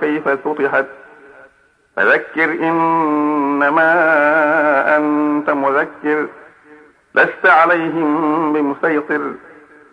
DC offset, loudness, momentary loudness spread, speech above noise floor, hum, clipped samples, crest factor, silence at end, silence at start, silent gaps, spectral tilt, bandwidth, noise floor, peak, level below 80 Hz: under 0.1%; -15 LUFS; 8 LU; 40 dB; none; under 0.1%; 14 dB; 0.55 s; 0 s; none; -7 dB/octave; 5.8 kHz; -54 dBFS; 0 dBFS; -66 dBFS